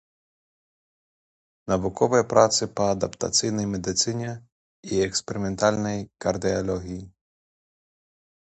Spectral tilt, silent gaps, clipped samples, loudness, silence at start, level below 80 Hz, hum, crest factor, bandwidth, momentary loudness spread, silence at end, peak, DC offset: -4 dB/octave; 4.52-4.83 s; under 0.1%; -24 LUFS; 1.65 s; -50 dBFS; none; 24 dB; 9 kHz; 14 LU; 1.45 s; -4 dBFS; under 0.1%